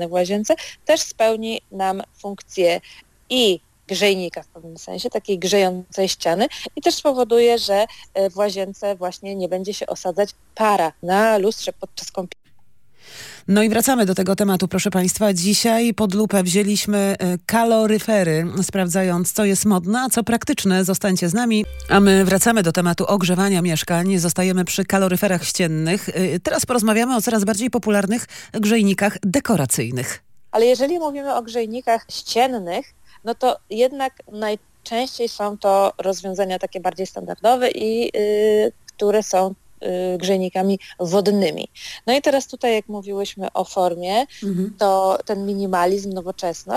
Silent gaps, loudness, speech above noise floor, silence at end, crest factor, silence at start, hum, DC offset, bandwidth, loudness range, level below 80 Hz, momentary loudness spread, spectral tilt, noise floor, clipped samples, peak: none; -19 LUFS; 40 dB; 0 s; 20 dB; 0 s; none; under 0.1%; 17 kHz; 5 LU; -52 dBFS; 10 LU; -4.5 dB/octave; -60 dBFS; under 0.1%; 0 dBFS